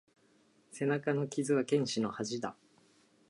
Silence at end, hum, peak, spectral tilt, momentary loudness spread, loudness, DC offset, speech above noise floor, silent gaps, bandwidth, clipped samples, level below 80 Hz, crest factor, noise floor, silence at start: 0.75 s; none; -18 dBFS; -5.5 dB/octave; 10 LU; -34 LUFS; under 0.1%; 35 dB; none; 11.5 kHz; under 0.1%; -78 dBFS; 18 dB; -68 dBFS; 0.75 s